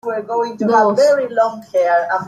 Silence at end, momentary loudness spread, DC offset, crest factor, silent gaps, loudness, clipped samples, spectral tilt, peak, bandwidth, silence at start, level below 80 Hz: 0 s; 8 LU; under 0.1%; 12 dB; none; -16 LUFS; under 0.1%; -5 dB/octave; -4 dBFS; 12.5 kHz; 0.05 s; -68 dBFS